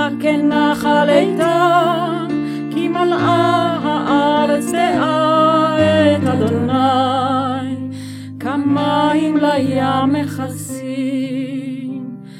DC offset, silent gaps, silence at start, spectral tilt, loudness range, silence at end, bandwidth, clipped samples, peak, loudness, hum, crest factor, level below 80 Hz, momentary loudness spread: under 0.1%; none; 0 s; -6 dB/octave; 3 LU; 0 s; 16 kHz; under 0.1%; 0 dBFS; -16 LUFS; none; 14 dB; -56 dBFS; 12 LU